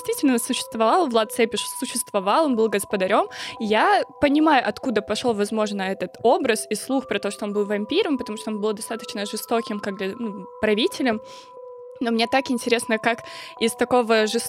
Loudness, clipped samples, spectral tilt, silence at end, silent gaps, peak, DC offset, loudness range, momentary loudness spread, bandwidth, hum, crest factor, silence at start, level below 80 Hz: -22 LUFS; under 0.1%; -3.5 dB/octave; 0 s; none; -4 dBFS; under 0.1%; 5 LU; 10 LU; 16.5 kHz; none; 18 dB; 0 s; -60 dBFS